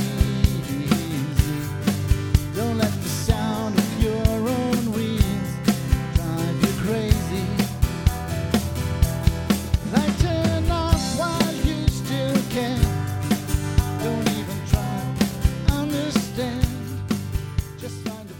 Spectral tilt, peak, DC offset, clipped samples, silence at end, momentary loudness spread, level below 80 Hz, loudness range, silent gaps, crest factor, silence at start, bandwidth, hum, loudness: -6 dB/octave; -4 dBFS; under 0.1%; under 0.1%; 0 s; 5 LU; -28 dBFS; 2 LU; none; 18 dB; 0 s; 19 kHz; none; -23 LUFS